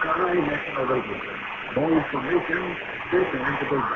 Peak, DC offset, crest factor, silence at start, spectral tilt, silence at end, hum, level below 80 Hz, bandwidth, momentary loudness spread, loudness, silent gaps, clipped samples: -10 dBFS; under 0.1%; 16 dB; 0 s; -7.5 dB/octave; 0 s; none; -52 dBFS; 6.8 kHz; 8 LU; -25 LUFS; none; under 0.1%